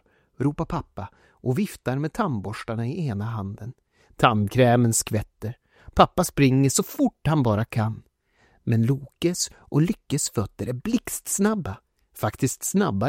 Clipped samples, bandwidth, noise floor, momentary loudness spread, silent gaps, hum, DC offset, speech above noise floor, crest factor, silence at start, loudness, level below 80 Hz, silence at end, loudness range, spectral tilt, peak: under 0.1%; 16.5 kHz; -63 dBFS; 15 LU; none; none; under 0.1%; 39 dB; 24 dB; 0.4 s; -24 LUFS; -48 dBFS; 0 s; 7 LU; -5.5 dB/octave; 0 dBFS